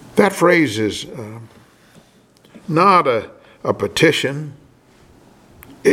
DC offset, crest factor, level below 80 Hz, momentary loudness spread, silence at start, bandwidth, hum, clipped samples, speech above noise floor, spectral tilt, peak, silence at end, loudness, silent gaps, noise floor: under 0.1%; 18 dB; -56 dBFS; 22 LU; 0.15 s; 16.5 kHz; none; under 0.1%; 34 dB; -5 dB/octave; 0 dBFS; 0 s; -16 LUFS; none; -51 dBFS